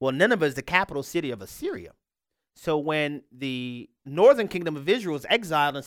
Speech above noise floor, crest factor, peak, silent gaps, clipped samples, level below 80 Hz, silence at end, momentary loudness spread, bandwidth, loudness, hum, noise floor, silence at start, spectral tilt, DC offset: 61 dB; 22 dB; -4 dBFS; none; under 0.1%; -60 dBFS; 0 s; 15 LU; 17 kHz; -25 LUFS; none; -86 dBFS; 0 s; -5 dB/octave; under 0.1%